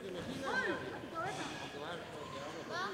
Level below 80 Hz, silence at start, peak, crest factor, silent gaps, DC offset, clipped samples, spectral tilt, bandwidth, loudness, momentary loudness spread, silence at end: -68 dBFS; 0 s; -26 dBFS; 16 dB; none; under 0.1%; under 0.1%; -4 dB/octave; 16 kHz; -41 LUFS; 9 LU; 0 s